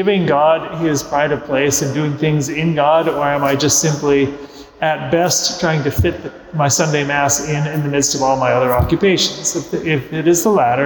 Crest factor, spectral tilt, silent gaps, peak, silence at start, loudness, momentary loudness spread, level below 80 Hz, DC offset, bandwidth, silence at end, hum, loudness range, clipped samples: 12 dB; -4 dB/octave; none; -4 dBFS; 0 s; -15 LUFS; 6 LU; -38 dBFS; under 0.1%; 19.5 kHz; 0 s; none; 1 LU; under 0.1%